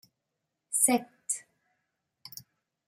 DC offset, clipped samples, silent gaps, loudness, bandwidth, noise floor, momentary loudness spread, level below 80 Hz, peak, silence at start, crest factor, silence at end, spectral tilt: under 0.1%; under 0.1%; none; -28 LUFS; 16 kHz; -84 dBFS; 22 LU; -82 dBFS; -10 dBFS; 0.7 s; 24 dB; 0.45 s; -1.5 dB/octave